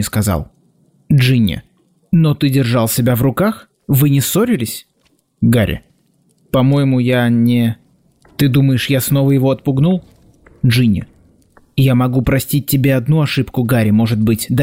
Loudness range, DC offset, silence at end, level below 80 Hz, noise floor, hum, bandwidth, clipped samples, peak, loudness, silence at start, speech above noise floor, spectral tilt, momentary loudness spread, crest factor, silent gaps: 2 LU; under 0.1%; 0 s; -40 dBFS; -59 dBFS; none; 16 kHz; under 0.1%; -4 dBFS; -14 LUFS; 0 s; 46 dB; -6.5 dB/octave; 7 LU; 10 dB; none